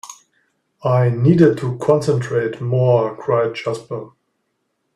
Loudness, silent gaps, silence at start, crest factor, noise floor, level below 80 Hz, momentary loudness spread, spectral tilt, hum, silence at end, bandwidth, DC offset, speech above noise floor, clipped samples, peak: -17 LUFS; none; 0.05 s; 18 dB; -71 dBFS; -56 dBFS; 13 LU; -8 dB/octave; none; 0.85 s; 11 kHz; under 0.1%; 54 dB; under 0.1%; 0 dBFS